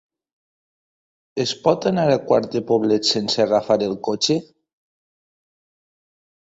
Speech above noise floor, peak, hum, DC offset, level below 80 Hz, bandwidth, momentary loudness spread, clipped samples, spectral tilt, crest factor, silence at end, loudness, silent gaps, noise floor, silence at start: over 71 dB; -2 dBFS; none; under 0.1%; -60 dBFS; 8 kHz; 6 LU; under 0.1%; -4.5 dB/octave; 20 dB; 2.15 s; -20 LUFS; none; under -90 dBFS; 1.35 s